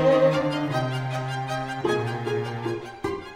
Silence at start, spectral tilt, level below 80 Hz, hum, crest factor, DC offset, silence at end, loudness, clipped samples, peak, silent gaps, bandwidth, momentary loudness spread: 0 s; -6.5 dB/octave; -56 dBFS; none; 16 dB; under 0.1%; 0 s; -26 LUFS; under 0.1%; -8 dBFS; none; 14 kHz; 11 LU